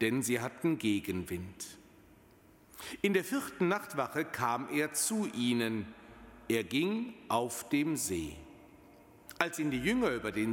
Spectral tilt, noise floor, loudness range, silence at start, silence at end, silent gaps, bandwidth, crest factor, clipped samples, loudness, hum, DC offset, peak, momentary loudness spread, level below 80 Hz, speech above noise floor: -4 dB/octave; -61 dBFS; 3 LU; 0 s; 0 s; none; 17 kHz; 22 dB; under 0.1%; -33 LUFS; none; under 0.1%; -12 dBFS; 15 LU; -62 dBFS; 28 dB